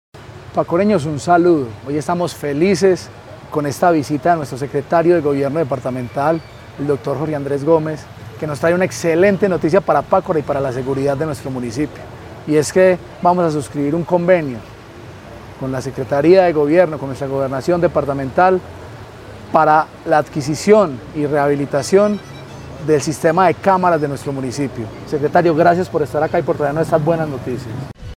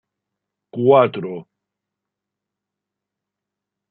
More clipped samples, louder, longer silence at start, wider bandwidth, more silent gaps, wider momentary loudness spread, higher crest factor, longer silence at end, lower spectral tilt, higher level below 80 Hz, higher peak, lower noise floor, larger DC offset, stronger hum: neither; about the same, -16 LUFS vs -16 LUFS; second, 0.15 s vs 0.75 s; first, 15.5 kHz vs 4.3 kHz; neither; second, 16 LU vs 20 LU; second, 16 dB vs 22 dB; second, 0.05 s vs 2.5 s; second, -6.5 dB/octave vs -11 dB/octave; first, -46 dBFS vs -70 dBFS; about the same, 0 dBFS vs -2 dBFS; second, -36 dBFS vs -84 dBFS; neither; second, none vs 50 Hz at -70 dBFS